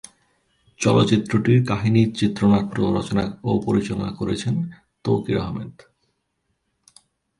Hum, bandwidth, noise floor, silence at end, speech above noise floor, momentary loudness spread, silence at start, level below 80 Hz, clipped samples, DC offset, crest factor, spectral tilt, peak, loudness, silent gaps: none; 11.5 kHz; -73 dBFS; 1.7 s; 53 dB; 9 LU; 0.8 s; -48 dBFS; under 0.1%; under 0.1%; 18 dB; -6.5 dB/octave; -4 dBFS; -21 LUFS; none